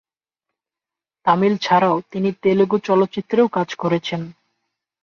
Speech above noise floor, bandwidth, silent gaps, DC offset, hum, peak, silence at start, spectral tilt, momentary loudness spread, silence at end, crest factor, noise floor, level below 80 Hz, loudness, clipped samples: 70 dB; 7 kHz; none; under 0.1%; none; -4 dBFS; 1.25 s; -7 dB/octave; 8 LU; 0.7 s; 16 dB; -88 dBFS; -64 dBFS; -19 LUFS; under 0.1%